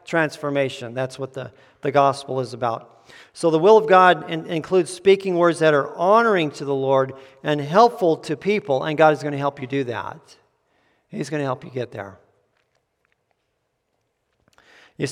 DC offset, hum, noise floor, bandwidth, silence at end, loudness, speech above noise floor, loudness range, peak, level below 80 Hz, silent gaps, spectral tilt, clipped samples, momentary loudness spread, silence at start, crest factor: under 0.1%; none; -73 dBFS; 12.5 kHz; 0 s; -20 LUFS; 53 dB; 15 LU; 0 dBFS; -70 dBFS; none; -6 dB/octave; under 0.1%; 15 LU; 0.1 s; 20 dB